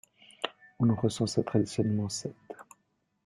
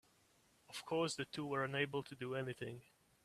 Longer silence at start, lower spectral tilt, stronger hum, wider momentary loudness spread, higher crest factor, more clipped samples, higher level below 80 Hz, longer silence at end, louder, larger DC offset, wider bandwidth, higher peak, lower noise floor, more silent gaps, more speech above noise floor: second, 0.4 s vs 0.7 s; first, -6 dB/octave vs -4.5 dB/octave; neither; first, 18 LU vs 12 LU; about the same, 20 dB vs 22 dB; neither; first, -64 dBFS vs -78 dBFS; first, 0.65 s vs 0.45 s; first, -30 LUFS vs -42 LUFS; neither; second, 12.5 kHz vs 14.5 kHz; first, -10 dBFS vs -22 dBFS; about the same, -75 dBFS vs -73 dBFS; neither; first, 47 dB vs 31 dB